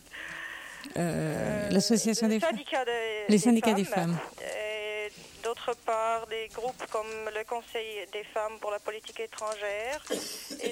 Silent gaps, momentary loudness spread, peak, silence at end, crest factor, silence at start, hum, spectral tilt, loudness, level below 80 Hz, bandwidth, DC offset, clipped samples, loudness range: none; 13 LU; -12 dBFS; 0 s; 20 dB; 0.1 s; none; -4.5 dB/octave; -31 LUFS; -64 dBFS; 16.5 kHz; under 0.1%; under 0.1%; 8 LU